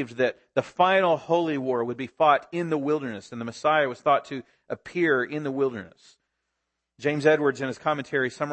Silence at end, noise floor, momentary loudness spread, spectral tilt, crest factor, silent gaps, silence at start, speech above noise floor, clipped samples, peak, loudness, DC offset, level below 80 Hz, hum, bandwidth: 0 s; -81 dBFS; 13 LU; -6 dB/octave; 18 dB; none; 0 s; 56 dB; under 0.1%; -6 dBFS; -25 LUFS; under 0.1%; -72 dBFS; none; 8.8 kHz